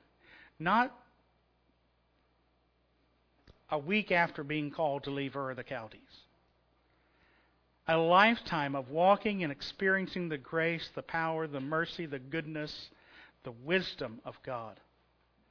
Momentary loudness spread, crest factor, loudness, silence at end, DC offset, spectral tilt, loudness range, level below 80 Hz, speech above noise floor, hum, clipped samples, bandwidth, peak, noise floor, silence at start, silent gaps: 15 LU; 24 dB; -32 LUFS; 0.75 s; under 0.1%; -6.5 dB/octave; 9 LU; -68 dBFS; 40 dB; none; under 0.1%; 5.4 kHz; -10 dBFS; -73 dBFS; 0.6 s; none